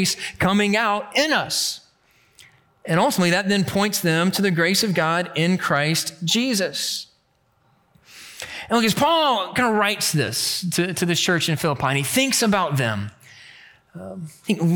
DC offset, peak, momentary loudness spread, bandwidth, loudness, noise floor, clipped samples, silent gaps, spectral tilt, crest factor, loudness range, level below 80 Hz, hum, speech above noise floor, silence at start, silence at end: under 0.1%; -6 dBFS; 12 LU; 19 kHz; -20 LUFS; -64 dBFS; under 0.1%; none; -4 dB/octave; 16 dB; 3 LU; -58 dBFS; none; 43 dB; 0 s; 0 s